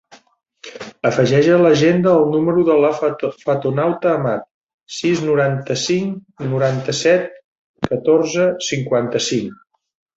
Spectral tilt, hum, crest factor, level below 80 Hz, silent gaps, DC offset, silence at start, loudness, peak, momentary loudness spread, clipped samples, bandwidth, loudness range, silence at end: -5.5 dB/octave; none; 16 dB; -56 dBFS; 4.54-4.67 s, 4.74-4.79 s, 7.44-7.74 s; under 0.1%; 0.65 s; -17 LUFS; 0 dBFS; 13 LU; under 0.1%; 8 kHz; 4 LU; 0.6 s